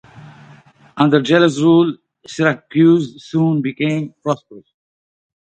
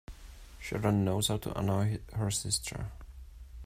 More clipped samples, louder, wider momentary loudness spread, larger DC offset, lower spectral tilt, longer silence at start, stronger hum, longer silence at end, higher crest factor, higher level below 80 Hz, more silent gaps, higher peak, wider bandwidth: neither; first, -16 LUFS vs -32 LUFS; second, 11 LU vs 22 LU; neither; first, -6.5 dB/octave vs -4.5 dB/octave; about the same, 0.15 s vs 0.1 s; neither; first, 0.9 s vs 0 s; about the same, 16 dB vs 18 dB; second, -62 dBFS vs -48 dBFS; neither; first, 0 dBFS vs -14 dBFS; second, 8.8 kHz vs 16 kHz